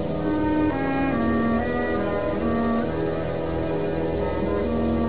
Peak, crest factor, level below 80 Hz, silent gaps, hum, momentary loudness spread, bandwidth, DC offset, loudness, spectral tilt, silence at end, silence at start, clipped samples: -10 dBFS; 12 dB; -36 dBFS; none; none; 4 LU; 4 kHz; 1%; -24 LUFS; -11.5 dB/octave; 0 s; 0 s; under 0.1%